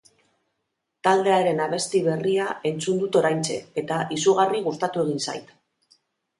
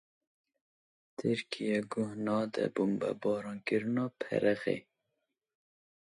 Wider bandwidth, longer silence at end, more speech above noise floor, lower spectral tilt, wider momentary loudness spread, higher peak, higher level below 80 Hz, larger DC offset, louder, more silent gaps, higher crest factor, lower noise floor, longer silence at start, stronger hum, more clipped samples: about the same, 11.5 kHz vs 11.5 kHz; second, 0.95 s vs 1.2 s; first, 56 dB vs 52 dB; second, -4.5 dB/octave vs -6.5 dB/octave; about the same, 8 LU vs 6 LU; first, -6 dBFS vs -16 dBFS; first, -70 dBFS vs -76 dBFS; neither; first, -23 LUFS vs -34 LUFS; neither; about the same, 18 dB vs 20 dB; second, -79 dBFS vs -85 dBFS; second, 1.05 s vs 1.2 s; neither; neither